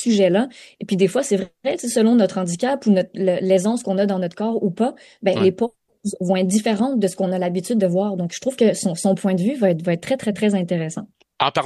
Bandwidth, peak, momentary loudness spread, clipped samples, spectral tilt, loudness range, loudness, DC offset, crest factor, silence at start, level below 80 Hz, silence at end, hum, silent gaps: 12.5 kHz; -2 dBFS; 7 LU; under 0.1%; -5.5 dB/octave; 2 LU; -20 LUFS; under 0.1%; 18 dB; 0 s; -64 dBFS; 0 s; none; none